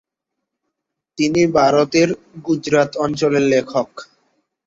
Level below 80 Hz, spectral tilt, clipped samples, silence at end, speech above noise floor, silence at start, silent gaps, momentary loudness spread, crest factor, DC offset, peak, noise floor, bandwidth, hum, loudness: -56 dBFS; -5.5 dB/octave; under 0.1%; 0.65 s; 63 dB; 1.2 s; none; 9 LU; 16 dB; under 0.1%; -2 dBFS; -80 dBFS; 7.8 kHz; none; -17 LUFS